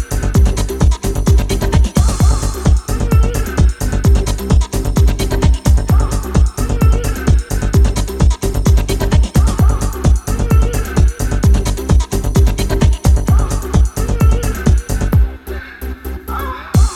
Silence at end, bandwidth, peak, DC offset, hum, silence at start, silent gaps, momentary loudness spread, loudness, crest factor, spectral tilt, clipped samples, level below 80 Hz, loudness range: 0 s; 14 kHz; 0 dBFS; under 0.1%; none; 0 s; none; 4 LU; -15 LUFS; 12 dB; -6 dB/octave; under 0.1%; -14 dBFS; 1 LU